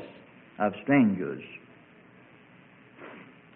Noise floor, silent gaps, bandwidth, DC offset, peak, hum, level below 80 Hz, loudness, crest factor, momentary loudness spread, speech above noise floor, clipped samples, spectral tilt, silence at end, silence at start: -55 dBFS; none; 3.7 kHz; under 0.1%; -12 dBFS; none; -70 dBFS; -27 LUFS; 20 dB; 26 LU; 29 dB; under 0.1%; -11 dB/octave; 0.35 s; 0 s